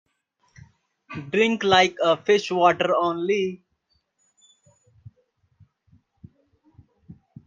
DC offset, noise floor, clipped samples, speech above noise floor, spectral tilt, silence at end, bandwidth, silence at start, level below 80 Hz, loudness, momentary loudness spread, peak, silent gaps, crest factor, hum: under 0.1%; -71 dBFS; under 0.1%; 50 dB; -4.5 dB/octave; 0.35 s; 7.6 kHz; 1.1 s; -68 dBFS; -21 LUFS; 14 LU; -4 dBFS; none; 22 dB; none